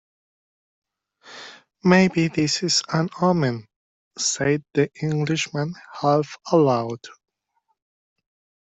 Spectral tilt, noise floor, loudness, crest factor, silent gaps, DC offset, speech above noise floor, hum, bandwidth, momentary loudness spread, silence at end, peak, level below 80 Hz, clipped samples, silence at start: -5 dB/octave; -72 dBFS; -21 LUFS; 20 dB; 3.76-4.11 s; under 0.1%; 51 dB; none; 8.2 kHz; 17 LU; 1.65 s; -4 dBFS; -62 dBFS; under 0.1%; 1.25 s